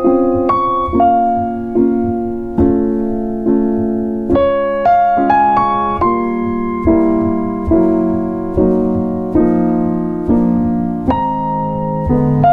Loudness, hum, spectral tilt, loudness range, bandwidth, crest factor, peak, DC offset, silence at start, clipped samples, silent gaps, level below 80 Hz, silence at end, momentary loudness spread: -14 LUFS; none; -10.5 dB/octave; 2 LU; 4.8 kHz; 12 dB; -2 dBFS; under 0.1%; 0 s; under 0.1%; none; -32 dBFS; 0 s; 6 LU